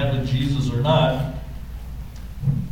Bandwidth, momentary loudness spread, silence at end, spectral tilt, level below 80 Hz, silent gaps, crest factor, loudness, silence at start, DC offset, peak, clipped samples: 15.5 kHz; 18 LU; 0 s; -7.5 dB/octave; -34 dBFS; none; 16 dB; -22 LUFS; 0 s; under 0.1%; -6 dBFS; under 0.1%